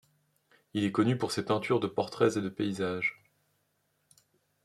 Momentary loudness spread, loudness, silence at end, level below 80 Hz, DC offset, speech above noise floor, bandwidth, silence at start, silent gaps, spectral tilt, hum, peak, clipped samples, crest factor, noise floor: 5 LU; -30 LUFS; 1.5 s; -72 dBFS; under 0.1%; 46 dB; 13.5 kHz; 0.75 s; none; -6 dB/octave; none; -12 dBFS; under 0.1%; 20 dB; -76 dBFS